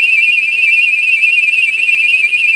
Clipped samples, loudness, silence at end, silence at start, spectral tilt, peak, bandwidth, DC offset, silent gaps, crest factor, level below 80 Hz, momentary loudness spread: under 0.1%; -8 LUFS; 0 s; 0 s; 2 dB/octave; 0 dBFS; 13 kHz; under 0.1%; none; 10 dB; -66 dBFS; 2 LU